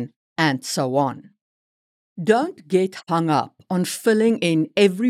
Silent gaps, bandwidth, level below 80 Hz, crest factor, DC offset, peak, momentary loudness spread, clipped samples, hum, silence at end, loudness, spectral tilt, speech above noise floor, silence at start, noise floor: 0.16-0.36 s, 1.41-2.16 s; 16 kHz; -76 dBFS; 18 dB; under 0.1%; -4 dBFS; 8 LU; under 0.1%; none; 0 s; -21 LUFS; -5.5 dB/octave; over 70 dB; 0 s; under -90 dBFS